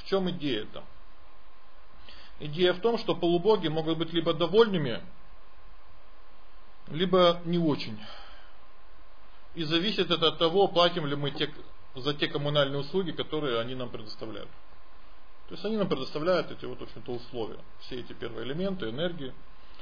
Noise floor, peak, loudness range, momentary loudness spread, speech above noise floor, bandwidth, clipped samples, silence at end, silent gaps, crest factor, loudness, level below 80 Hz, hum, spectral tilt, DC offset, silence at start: -54 dBFS; -8 dBFS; 7 LU; 19 LU; 26 dB; 5.4 kHz; under 0.1%; 0 s; none; 22 dB; -28 LUFS; -56 dBFS; none; -7 dB/octave; 2%; 0 s